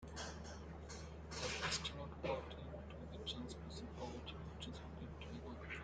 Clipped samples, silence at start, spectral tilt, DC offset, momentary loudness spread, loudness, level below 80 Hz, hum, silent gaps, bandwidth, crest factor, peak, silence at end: under 0.1%; 0 s; -4 dB/octave; under 0.1%; 10 LU; -48 LUFS; -58 dBFS; none; none; 9.6 kHz; 20 dB; -28 dBFS; 0 s